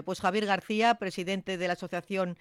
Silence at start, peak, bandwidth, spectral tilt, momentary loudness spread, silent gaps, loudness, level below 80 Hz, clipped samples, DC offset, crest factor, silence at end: 0 s; -14 dBFS; 14.5 kHz; -5 dB/octave; 7 LU; none; -30 LUFS; -68 dBFS; under 0.1%; under 0.1%; 16 dB; 0.05 s